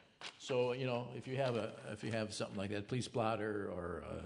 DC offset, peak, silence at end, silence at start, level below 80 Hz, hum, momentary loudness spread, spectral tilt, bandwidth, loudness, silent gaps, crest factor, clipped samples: under 0.1%; -20 dBFS; 0 s; 0.2 s; -70 dBFS; none; 8 LU; -5.5 dB/octave; 11 kHz; -40 LUFS; none; 20 dB; under 0.1%